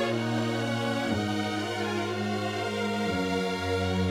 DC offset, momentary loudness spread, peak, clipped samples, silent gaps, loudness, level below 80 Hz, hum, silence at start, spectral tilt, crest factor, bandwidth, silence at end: under 0.1%; 2 LU; -16 dBFS; under 0.1%; none; -29 LUFS; -58 dBFS; none; 0 s; -5.5 dB/octave; 14 dB; 16 kHz; 0 s